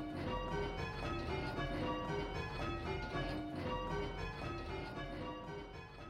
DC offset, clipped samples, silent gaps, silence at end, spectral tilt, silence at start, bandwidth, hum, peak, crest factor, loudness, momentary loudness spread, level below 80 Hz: under 0.1%; under 0.1%; none; 0 s; -6.5 dB/octave; 0 s; 13.5 kHz; none; -26 dBFS; 16 dB; -42 LUFS; 5 LU; -50 dBFS